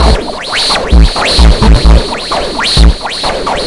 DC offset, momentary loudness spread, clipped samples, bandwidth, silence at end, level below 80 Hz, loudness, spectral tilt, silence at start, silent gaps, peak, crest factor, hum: 3%; 7 LU; 1%; 11.5 kHz; 0 s; -10 dBFS; -9 LUFS; -4.5 dB/octave; 0 s; none; 0 dBFS; 8 dB; none